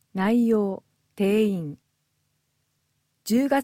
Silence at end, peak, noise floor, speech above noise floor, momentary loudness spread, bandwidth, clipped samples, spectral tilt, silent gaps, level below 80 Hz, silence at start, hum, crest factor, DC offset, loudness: 0 s; -10 dBFS; -73 dBFS; 51 dB; 17 LU; 16.5 kHz; under 0.1%; -6.5 dB/octave; none; -68 dBFS; 0.15 s; none; 16 dB; under 0.1%; -24 LUFS